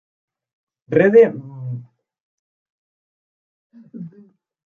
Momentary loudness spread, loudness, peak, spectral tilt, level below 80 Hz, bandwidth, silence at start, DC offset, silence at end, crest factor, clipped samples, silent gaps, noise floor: 25 LU; -14 LUFS; -2 dBFS; -9.5 dB/octave; -68 dBFS; 3.8 kHz; 0.9 s; under 0.1%; 0.6 s; 20 dB; under 0.1%; 2.20-3.70 s; -51 dBFS